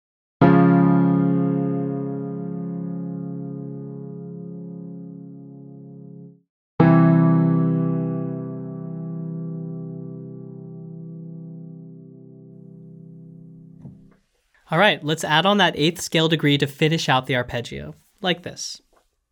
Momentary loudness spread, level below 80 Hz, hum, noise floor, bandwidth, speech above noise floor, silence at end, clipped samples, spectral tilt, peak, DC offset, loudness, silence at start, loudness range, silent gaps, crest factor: 24 LU; -58 dBFS; none; -63 dBFS; 16 kHz; 42 dB; 0.55 s; under 0.1%; -6 dB/octave; -2 dBFS; under 0.1%; -20 LUFS; 0.4 s; 18 LU; 6.49-6.78 s; 20 dB